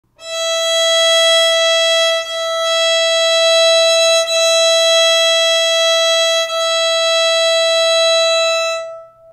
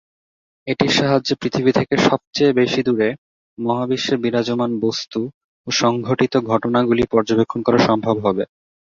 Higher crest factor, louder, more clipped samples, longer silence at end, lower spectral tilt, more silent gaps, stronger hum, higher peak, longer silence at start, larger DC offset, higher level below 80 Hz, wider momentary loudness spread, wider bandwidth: second, 10 dB vs 18 dB; first, -12 LUFS vs -18 LUFS; neither; second, 0.25 s vs 0.55 s; second, 4 dB/octave vs -5.5 dB/octave; second, none vs 2.27-2.31 s, 3.18-3.57 s, 5.34-5.64 s; neither; second, -4 dBFS vs 0 dBFS; second, 0.2 s vs 0.65 s; neither; second, -62 dBFS vs -52 dBFS; second, 7 LU vs 10 LU; first, 16 kHz vs 7.6 kHz